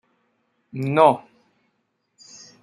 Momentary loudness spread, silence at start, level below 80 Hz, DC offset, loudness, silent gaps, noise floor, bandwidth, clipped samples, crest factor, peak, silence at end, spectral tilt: 27 LU; 0.75 s; -72 dBFS; under 0.1%; -19 LUFS; none; -72 dBFS; 11 kHz; under 0.1%; 22 dB; -2 dBFS; 1.45 s; -6.5 dB/octave